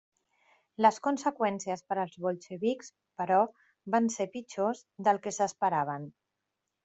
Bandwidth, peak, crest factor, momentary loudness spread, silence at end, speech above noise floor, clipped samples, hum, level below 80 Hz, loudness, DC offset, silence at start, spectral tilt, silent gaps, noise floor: 8.2 kHz; -10 dBFS; 22 dB; 12 LU; 0.75 s; 55 dB; under 0.1%; none; -78 dBFS; -31 LUFS; under 0.1%; 0.8 s; -5 dB/octave; none; -85 dBFS